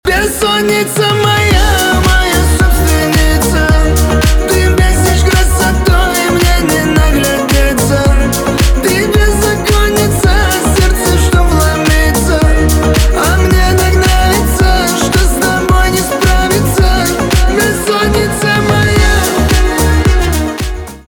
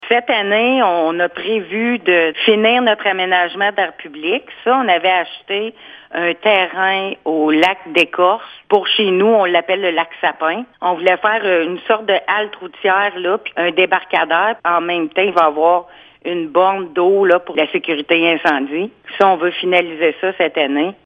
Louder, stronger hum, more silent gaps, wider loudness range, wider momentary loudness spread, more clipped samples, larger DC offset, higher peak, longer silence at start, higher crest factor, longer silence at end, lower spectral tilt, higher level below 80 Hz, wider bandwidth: first, -10 LUFS vs -15 LUFS; neither; neither; about the same, 1 LU vs 2 LU; second, 2 LU vs 7 LU; neither; neither; about the same, 0 dBFS vs 0 dBFS; about the same, 0.05 s vs 0 s; second, 8 dB vs 16 dB; about the same, 0.05 s vs 0.15 s; about the same, -4.5 dB/octave vs -5.5 dB/octave; first, -12 dBFS vs -66 dBFS; first, over 20 kHz vs 8.8 kHz